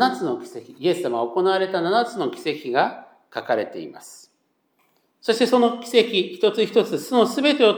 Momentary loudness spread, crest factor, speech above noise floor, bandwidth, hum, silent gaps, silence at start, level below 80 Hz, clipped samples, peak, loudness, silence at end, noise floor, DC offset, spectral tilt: 14 LU; 20 dB; 48 dB; over 20 kHz; none; none; 0 s; -84 dBFS; under 0.1%; -2 dBFS; -21 LUFS; 0 s; -69 dBFS; under 0.1%; -4.5 dB/octave